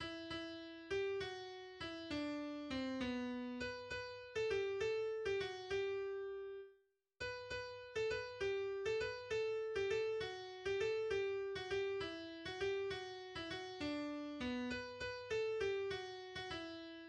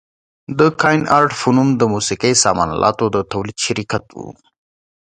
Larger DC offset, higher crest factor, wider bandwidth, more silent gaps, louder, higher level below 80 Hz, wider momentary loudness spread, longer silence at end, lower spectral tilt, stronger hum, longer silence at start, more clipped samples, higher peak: neither; about the same, 16 dB vs 16 dB; about the same, 10 kHz vs 11 kHz; neither; second, -43 LUFS vs -16 LUFS; second, -68 dBFS vs -46 dBFS; second, 8 LU vs 11 LU; second, 0 s vs 0.7 s; about the same, -4.5 dB/octave vs -4 dB/octave; neither; second, 0 s vs 0.5 s; neither; second, -28 dBFS vs 0 dBFS